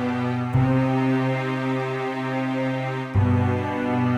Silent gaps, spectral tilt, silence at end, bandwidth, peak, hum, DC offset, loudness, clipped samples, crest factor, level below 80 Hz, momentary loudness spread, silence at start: none; -8.5 dB/octave; 0 s; 8.6 kHz; -10 dBFS; none; under 0.1%; -23 LUFS; under 0.1%; 12 dB; -46 dBFS; 5 LU; 0 s